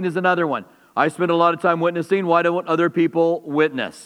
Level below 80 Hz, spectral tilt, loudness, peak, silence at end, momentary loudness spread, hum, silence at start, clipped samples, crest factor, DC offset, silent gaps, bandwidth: -74 dBFS; -6.5 dB/octave; -19 LUFS; -2 dBFS; 0.05 s; 4 LU; none; 0 s; under 0.1%; 16 dB; under 0.1%; none; 12 kHz